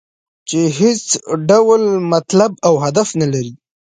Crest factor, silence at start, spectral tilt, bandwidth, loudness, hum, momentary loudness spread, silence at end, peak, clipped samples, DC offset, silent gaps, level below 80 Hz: 14 dB; 0.45 s; -5 dB/octave; 9.6 kHz; -14 LUFS; none; 9 LU; 0.3 s; 0 dBFS; under 0.1%; under 0.1%; none; -58 dBFS